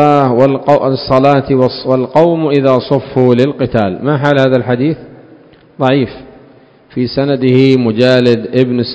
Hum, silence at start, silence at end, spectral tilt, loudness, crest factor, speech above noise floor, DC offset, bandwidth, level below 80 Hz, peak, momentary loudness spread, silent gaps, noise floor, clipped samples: none; 0 s; 0 s; -8 dB/octave; -11 LUFS; 10 dB; 32 dB; 0.2%; 8 kHz; -44 dBFS; 0 dBFS; 6 LU; none; -42 dBFS; 1%